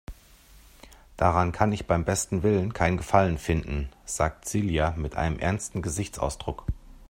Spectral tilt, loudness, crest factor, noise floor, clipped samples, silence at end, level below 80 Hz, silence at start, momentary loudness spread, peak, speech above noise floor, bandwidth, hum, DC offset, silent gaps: -5.5 dB/octave; -27 LUFS; 24 dB; -53 dBFS; under 0.1%; 0.05 s; -40 dBFS; 0.1 s; 10 LU; -4 dBFS; 28 dB; 16 kHz; none; under 0.1%; none